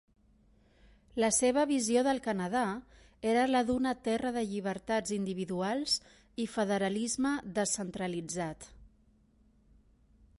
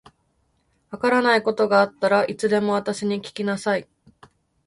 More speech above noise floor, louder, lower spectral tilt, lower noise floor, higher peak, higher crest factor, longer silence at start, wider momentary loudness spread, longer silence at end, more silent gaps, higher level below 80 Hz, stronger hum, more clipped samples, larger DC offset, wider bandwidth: second, 34 dB vs 46 dB; second, -32 LUFS vs -21 LUFS; about the same, -4 dB/octave vs -5 dB/octave; about the same, -66 dBFS vs -67 dBFS; second, -16 dBFS vs -4 dBFS; about the same, 18 dB vs 18 dB; first, 1.15 s vs 0.9 s; about the same, 10 LU vs 8 LU; first, 1.55 s vs 0.85 s; neither; about the same, -62 dBFS vs -64 dBFS; neither; neither; neither; about the same, 11.5 kHz vs 11.5 kHz